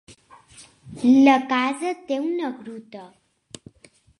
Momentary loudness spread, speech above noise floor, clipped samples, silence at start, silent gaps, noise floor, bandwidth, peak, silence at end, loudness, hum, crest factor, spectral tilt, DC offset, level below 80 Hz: 27 LU; 35 dB; under 0.1%; 0.6 s; none; -55 dBFS; 11 kHz; -2 dBFS; 1.15 s; -20 LUFS; none; 20 dB; -4.5 dB/octave; under 0.1%; -66 dBFS